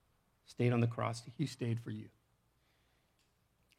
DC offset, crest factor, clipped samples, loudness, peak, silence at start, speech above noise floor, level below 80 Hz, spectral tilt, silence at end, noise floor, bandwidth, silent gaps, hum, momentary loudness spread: under 0.1%; 22 dB; under 0.1%; -37 LUFS; -18 dBFS; 0.5 s; 40 dB; -76 dBFS; -7 dB/octave; 1.7 s; -76 dBFS; 11 kHz; none; none; 17 LU